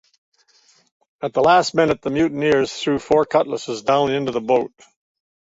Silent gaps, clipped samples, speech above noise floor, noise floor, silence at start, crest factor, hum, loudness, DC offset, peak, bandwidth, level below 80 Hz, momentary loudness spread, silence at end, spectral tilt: none; under 0.1%; 39 dB; -57 dBFS; 1.2 s; 18 dB; none; -19 LUFS; under 0.1%; -2 dBFS; 8 kHz; -54 dBFS; 9 LU; 0.9 s; -5 dB/octave